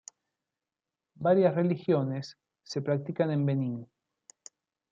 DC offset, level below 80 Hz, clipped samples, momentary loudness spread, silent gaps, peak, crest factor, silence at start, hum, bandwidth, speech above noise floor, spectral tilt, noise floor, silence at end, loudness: under 0.1%; -76 dBFS; under 0.1%; 14 LU; none; -12 dBFS; 18 dB; 1.2 s; none; 7.6 kHz; over 62 dB; -7.5 dB/octave; under -90 dBFS; 1.05 s; -29 LUFS